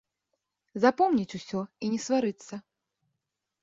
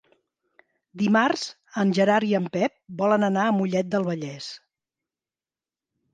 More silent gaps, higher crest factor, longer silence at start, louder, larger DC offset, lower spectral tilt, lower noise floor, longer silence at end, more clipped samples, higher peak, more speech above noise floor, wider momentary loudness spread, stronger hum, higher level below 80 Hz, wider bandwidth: neither; about the same, 22 dB vs 20 dB; second, 0.75 s vs 0.95 s; second, -28 LUFS vs -24 LUFS; neither; about the same, -5.5 dB/octave vs -6 dB/octave; second, -85 dBFS vs under -90 dBFS; second, 1 s vs 1.55 s; neither; about the same, -8 dBFS vs -6 dBFS; second, 57 dB vs over 67 dB; first, 19 LU vs 12 LU; neither; about the same, -70 dBFS vs -72 dBFS; second, 8 kHz vs 9.2 kHz